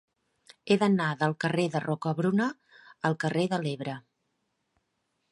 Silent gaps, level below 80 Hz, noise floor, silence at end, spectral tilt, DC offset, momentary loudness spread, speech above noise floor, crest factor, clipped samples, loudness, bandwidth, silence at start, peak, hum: none; -74 dBFS; -78 dBFS; 1.3 s; -6.5 dB/octave; under 0.1%; 12 LU; 51 dB; 20 dB; under 0.1%; -28 LUFS; 11.5 kHz; 0.65 s; -10 dBFS; none